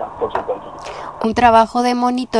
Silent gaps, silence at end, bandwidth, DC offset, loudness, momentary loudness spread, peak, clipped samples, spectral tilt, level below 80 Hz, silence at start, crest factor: none; 0 s; 11 kHz; 0.2%; -16 LUFS; 18 LU; 0 dBFS; under 0.1%; -5 dB/octave; -42 dBFS; 0 s; 16 dB